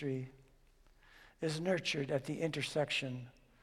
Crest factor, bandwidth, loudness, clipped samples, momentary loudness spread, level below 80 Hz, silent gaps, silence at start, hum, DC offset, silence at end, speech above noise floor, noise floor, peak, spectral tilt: 18 dB; 14.5 kHz; -37 LUFS; under 0.1%; 12 LU; -66 dBFS; none; 0 s; none; under 0.1%; 0.3 s; 28 dB; -65 dBFS; -22 dBFS; -5 dB/octave